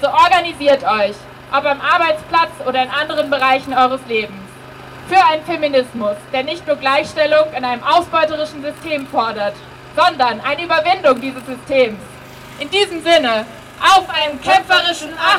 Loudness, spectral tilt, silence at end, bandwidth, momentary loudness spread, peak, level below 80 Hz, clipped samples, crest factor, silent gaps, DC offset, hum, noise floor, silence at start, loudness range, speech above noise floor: -15 LUFS; -3 dB/octave; 0 s; 16 kHz; 14 LU; -2 dBFS; -50 dBFS; under 0.1%; 14 dB; none; under 0.1%; none; -35 dBFS; 0 s; 2 LU; 20 dB